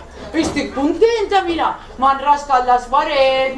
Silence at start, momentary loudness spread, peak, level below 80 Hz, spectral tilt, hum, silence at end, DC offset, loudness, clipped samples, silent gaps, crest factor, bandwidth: 0 s; 6 LU; -2 dBFS; -40 dBFS; -4 dB/octave; none; 0 s; under 0.1%; -16 LUFS; under 0.1%; none; 14 dB; 11 kHz